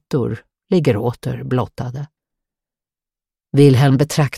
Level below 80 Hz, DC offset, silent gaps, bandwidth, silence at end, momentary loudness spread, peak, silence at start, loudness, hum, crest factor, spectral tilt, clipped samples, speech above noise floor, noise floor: -50 dBFS; under 0.1%; none; 14.5 kHz; 0 s; 17 LU; -2 dBFS; 0.1 s; -17 LUFS; none; 16 dB; -7 dB/octave; under 0.1%; 74 dB; -90 dBFS